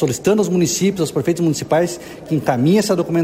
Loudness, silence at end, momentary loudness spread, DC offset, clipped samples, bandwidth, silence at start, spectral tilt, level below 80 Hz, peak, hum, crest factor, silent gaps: -17 LUFS; 0 s; 6 LU; under 0.1%; under 0.1%; 16 kHz; 0 s; -5.5 dB/octave; -52 dBFS; -2 dBFS; none; 14 dB; none